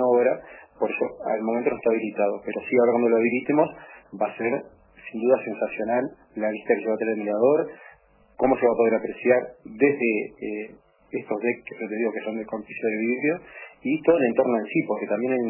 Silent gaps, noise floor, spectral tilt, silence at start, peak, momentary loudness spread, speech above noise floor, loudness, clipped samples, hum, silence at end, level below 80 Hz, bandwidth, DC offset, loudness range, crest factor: none; -55 dBFS; -11 dB/octave; 0 s; -6 dBFS; 12 LU; 32 dB; -24 LUFS; under 0.1%; none; 0 s; -66 dBFS; 3.1 kHz; under 0.1%; 4 LU; 18 dB